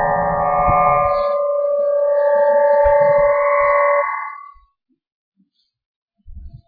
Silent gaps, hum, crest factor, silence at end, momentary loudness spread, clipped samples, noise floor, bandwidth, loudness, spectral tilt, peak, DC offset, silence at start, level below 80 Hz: 5.12-5.32 s, 5.86-6.08 s; none; 14 dB; 0.1 s; 5 LU; under 0.1%; -64 dBFS; 4.8 kHz; -15 LUFS; -9.5 dB/octave; -4 dBFS; under 0.1%; 0 s; -38 dBFS